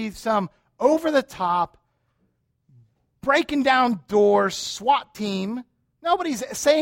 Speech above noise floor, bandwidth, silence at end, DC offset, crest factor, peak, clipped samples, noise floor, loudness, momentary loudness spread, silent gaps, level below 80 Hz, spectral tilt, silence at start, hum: 48 dB; 16.5 kHz; 0 s; under 0.1%; 18 dB; -6 dBFS; under 0.1%; -70 dBFS; -22 LUFS; 11 LU; none; -58 dBFS; -4 dB/octave; 0 s; none